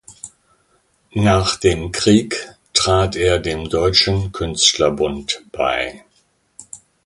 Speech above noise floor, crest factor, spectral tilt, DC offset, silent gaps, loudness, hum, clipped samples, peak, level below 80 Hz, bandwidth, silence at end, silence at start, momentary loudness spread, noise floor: 44 dB; 18 dB; -4 dB/octave; under 0.1%; none; -17 LUFS; none; under 0.1%; 0 dBFS; -36 dBFS; 11.5 kHz; 0.3 s; 0.1 s; 17 LU; -61 dBFS